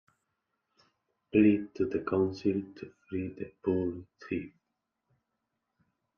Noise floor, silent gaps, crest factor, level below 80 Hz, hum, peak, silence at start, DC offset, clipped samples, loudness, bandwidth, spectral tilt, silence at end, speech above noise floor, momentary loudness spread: -84 dBFS; none; 20 dB; -68 dBFS; none; -12 dBFS; 1.35 s; under 0.1%; under 0.1%; -31 LUFS; 6.6 kHz; -9 dB/octave; 1.7 s; 54 dB; 18 LU